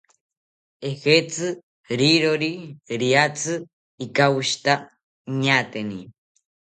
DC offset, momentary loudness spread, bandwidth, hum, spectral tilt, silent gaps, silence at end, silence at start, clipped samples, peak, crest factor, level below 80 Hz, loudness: under 0.1%; 14 LU; 9.4 kHz; none; -4 dB/octave; 1.63-1.84 s, 3.73-3.98 s, 5.03-5.25 s; 0.65 s; 0.8 s; under 0.1%; -2 dBFS; 20 dB; -66 dBFS; -21 LUFS